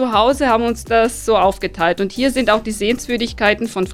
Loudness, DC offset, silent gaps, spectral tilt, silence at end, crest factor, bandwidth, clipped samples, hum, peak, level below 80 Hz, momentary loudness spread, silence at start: -17 LUFS; under 0.1%; none; -4 dB/octave; 0 s; 16 dB; 16.5 kHz; under 0.1%; none; 0 dBFS; -36 dBFS; 5 LU; 0 s